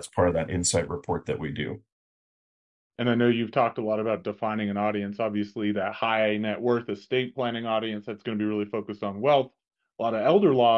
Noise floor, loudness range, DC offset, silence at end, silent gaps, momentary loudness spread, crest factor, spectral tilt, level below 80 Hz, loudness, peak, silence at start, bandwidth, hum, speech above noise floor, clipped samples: under -90 dBFS; 2 LU; under 0.1%; 0 s; 1.92-2.90 s; 9 LU; 18 dB; -5 dB/octave; -60 dBFS; -27 LUFS; -8 dBFS; 0 s; 11.5 kHz; none; over 64 dB; under 0.1%